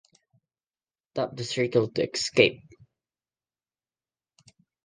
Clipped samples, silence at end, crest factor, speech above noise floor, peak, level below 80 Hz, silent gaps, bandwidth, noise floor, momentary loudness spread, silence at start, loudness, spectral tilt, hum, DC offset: under 0.1%; 2.3 s; 28 dB; over 65 dB; -2 dBFS; -66 dBFS; none; 9.8 kHz; under -90 dBFS; 10 LU; 1.15 s; -26 LUFS; -4 dB/octave; none; under 0.1%